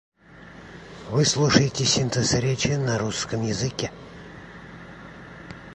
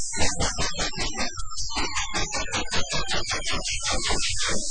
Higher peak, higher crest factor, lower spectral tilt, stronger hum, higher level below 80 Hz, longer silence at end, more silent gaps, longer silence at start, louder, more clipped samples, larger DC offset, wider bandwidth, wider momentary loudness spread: first, -2 dBFS vs -8 dBFS; first, 24 dB vs 16 dB; first, -4 dB/octave vs -1.5 dB/octave; neither; second, -48 dBFS vs -34 dBFS; about the same, 0 s vs 0 s; neither; first, 0.35 s vs 0 s; first, -23 LUFS vs -26 LUFS; neither; neither; about the same, 11.5 kHz vs 10.5 kHz; first, 23 LU vs 4 LU